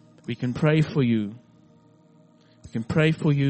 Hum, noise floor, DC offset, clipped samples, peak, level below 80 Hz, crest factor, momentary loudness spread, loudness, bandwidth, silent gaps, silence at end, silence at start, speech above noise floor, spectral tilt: none; -56 dBFS; under 0.1%; under 0.1%; -6 dBFS; -56 dBFS; 18 dB; 14 LU; -24 LUFS; 8.4 kHz; none; 0 s; 0.3 s; 33 dB; -8 dB/octave